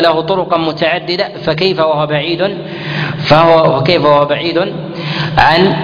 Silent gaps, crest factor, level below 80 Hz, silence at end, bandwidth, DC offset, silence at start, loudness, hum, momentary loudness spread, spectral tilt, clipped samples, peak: none; 12 dB; -40 dBFS; 0 s; 5.4 kHz; under 0.1%; 0 s; -12 LUFS; none; 10 LU; -7 dB/octave; 0.2%; 0 dBFS